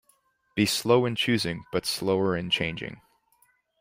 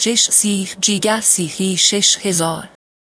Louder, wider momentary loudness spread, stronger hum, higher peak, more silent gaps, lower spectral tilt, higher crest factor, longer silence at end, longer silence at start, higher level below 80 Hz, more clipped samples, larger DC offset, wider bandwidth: second, -26 LUFS vs -14 LUFS; first, 11 LU vs 7 LU; neither; second, -6 dBFS vs 0 dBFS; neither; first, -4.5 dB/octave vs -2 dB/octave; first, 22 dB vs 16 dB; first, 0.85 s vs 0.5 s; first, 0.55 s vs 0 s; about the same, -58 dBFS vs -62 dBFS; neither; neither; first, 16 kHz vs 11 kHz